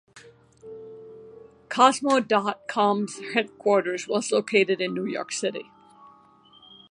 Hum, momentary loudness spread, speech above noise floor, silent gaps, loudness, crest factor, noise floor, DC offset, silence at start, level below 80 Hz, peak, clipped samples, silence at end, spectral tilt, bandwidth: none; 23 LU; 31 dB; none; -24 LUFS; 22 dB; -55 dBFS; under 0.1%; 0.15 s; -74 dBFS; -4 dBFS; under 0.1%; 1.3 s; -3.5 dB/octave; 11.5 kHz